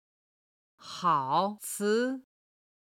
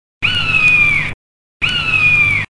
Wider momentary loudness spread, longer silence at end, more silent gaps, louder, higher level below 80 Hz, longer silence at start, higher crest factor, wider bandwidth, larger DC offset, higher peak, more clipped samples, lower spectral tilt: first, 11 LU vs 8 LU; first, 0.75 s vs 0.15 s; second, none vs 1.14-1.60 s; second, -29 LUFS vs -11 LUFS; second, -84 dBFS vs -36 dBFS; first, 0.8 s vs 0.2 s; first, 20 dB vs 12 dB; first, 16.5 kHz vs 11.5 kHz; neither; second, -14 dBFS vs -2 dBFS; neither; about the same, -4 dB/octave vs -3 dB/octave